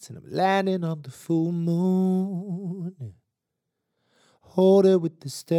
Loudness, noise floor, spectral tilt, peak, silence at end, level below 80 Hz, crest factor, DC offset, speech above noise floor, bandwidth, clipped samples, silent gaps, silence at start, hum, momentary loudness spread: -24 LUFS; -82 dBFS; -7.5 dB/octave; -8 dBFS; 0 s; -76 dBFS; 16 dB; under 0.1%; 59 dB; 14 kHz; under 0.1%; none; 0 s; none; 17 LU